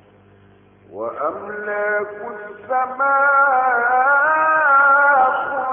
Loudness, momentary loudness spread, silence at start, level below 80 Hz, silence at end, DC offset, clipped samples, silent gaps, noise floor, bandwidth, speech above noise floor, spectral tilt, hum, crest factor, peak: -16 LUFS; 16 LU; 0.95 s; -66 dBFS; 0 s; under 0.1%; under 0.1%; none; -50 dBFS; 3.5 kHz; 31 dB; -8.5 dB/octave; none; 14 dB; -4 dBFS